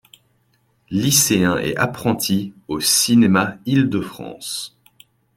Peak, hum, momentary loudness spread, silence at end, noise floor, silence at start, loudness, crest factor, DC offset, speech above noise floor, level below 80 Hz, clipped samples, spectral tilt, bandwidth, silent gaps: -2 dBFS; none; 14 LU; 0.7 s; -63 dBFS; 0.9 s; -18 LUFS; 18 dB; under 0.1%; 44 dB; -54 dBFS; under 0.1%; -3.5 dB/octave; 16.5 kHz; none